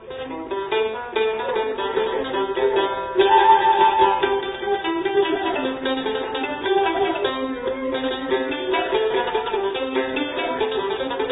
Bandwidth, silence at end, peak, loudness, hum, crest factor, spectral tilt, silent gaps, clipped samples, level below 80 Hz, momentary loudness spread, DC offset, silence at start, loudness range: 4 kHz; 0 s; -4 dBFS; -21 LUFS; none; 18 dB; -8.5 dB/octave; none; under 0.1%; -52 dBFS; 9 LU; under 0.1%; 0 s; 5 LU